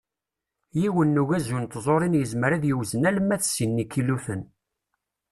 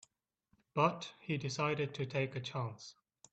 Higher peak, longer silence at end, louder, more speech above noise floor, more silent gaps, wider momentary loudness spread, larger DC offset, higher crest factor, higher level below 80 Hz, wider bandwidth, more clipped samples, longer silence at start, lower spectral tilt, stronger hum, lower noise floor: first, -8 dBFS vs -16 dBFS; first, 0.85 s vs 0.4 s; first, -24 LUFS vs -37 LUFS; first, 63 dB vs 41 dB; neither; second, 7 LU vs 12 LU; neither; second, 16 dB vs 22 dB; first, -58 dBFS vs -74 dBFS; first, 13 kHz vs 8.6 kHz; neither; about the same, 0.75 s vs 0.75 s; about the same, -6 dB/octave vs -5.5 dB/octave; neither; first, -87 dBFS vs -78 dBFS